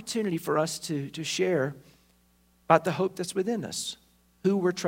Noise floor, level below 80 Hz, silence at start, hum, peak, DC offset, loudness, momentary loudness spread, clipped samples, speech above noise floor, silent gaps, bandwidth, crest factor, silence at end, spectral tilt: -64 dBFS; -68 dBFS; 0 s; 60 Hz at -60 dBFS; -4 dBFS; under 0.1%; -28 LUFS; 10 LU; under 0.1%; 37 dB; none; 16.5 kHz; 24 dB; 0 s; -4.5 dB/octave